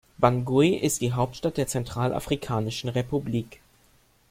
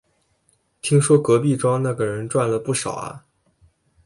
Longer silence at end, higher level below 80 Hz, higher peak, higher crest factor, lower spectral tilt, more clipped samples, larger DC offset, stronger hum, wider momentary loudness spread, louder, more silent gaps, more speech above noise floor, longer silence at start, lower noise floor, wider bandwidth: about the same, 0.75 s vs 0.85 s; first, -50 dBFS vs -58 dBFS; about the same, -4 dBFS vs -4 dBFS; about the same, 22 dB vs 18 dB; about the same, -5.5 dB/octave vs -6 dB/octave; neither; neither; neither; second, 7 LU vs 13 LU; second, -26 LUFS vs -20 LUFS; neither; second, 36 dB vs 46 dB; second, 0.2 s vs 0.85 s; second, -61 dBFS vs -65 dBFS; first, 16.5 kHz vs 11.5 kHz